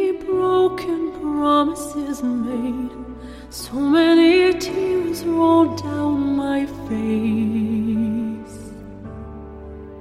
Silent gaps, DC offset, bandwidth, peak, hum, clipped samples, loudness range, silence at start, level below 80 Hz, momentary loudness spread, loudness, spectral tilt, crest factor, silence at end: none; under 0.1%; 14.5 kHz; -6 dBFS; none; under 0.1%; 6 LU; 0 s; -44 dBFS; 21 LU; -19 LUFS; -5.5 dB/octave; 14 dB; 0 s